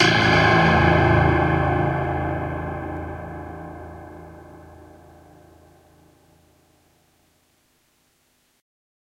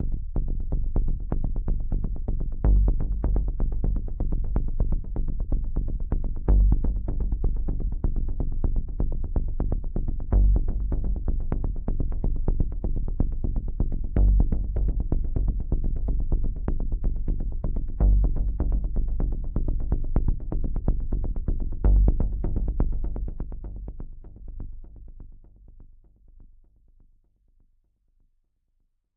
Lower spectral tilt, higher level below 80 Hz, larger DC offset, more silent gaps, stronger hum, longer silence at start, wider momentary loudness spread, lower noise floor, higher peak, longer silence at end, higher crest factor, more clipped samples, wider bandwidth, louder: second, -6 dB/octave vs -14 dB/octave; second, -38 dBFS vs -24 dBFS; neither; neither; neither; about the same, 0 s vs 0 s; first, 23 LU vs 9 LU; second, -65 dBFS vs -71 dBFS; first, -2 dBFS vs -6 dBFS; first, 4.4 s vs 2.7 s; about the same, 20 dB vs 18 dB; neither; first, 11 kHz vs 1.8 kHz; first, -19 LUFS vs -29 LUFS